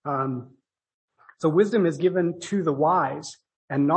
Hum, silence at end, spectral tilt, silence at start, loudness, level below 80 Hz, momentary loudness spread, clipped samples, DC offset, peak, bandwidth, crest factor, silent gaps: none; 0 s; -7 dB/octave; 0.05 s; -24 LUFS; -72 dBFS; 11 LU; under 0.1%; under 0.1%; -8 dBFS; 8.8 kHz; 16 dB; 0.94-1.08 s, 3.56-3.68 s